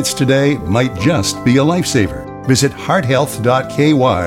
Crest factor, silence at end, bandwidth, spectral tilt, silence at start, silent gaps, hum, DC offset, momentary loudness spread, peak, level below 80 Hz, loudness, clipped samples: 12 dB; 0 s; 17 kHz; -5 dB/octave; 0 s; none; none; under 0.1%; 4 LU; -2 dBFS; -40 dBFS; -14 LUFS; under 0.1%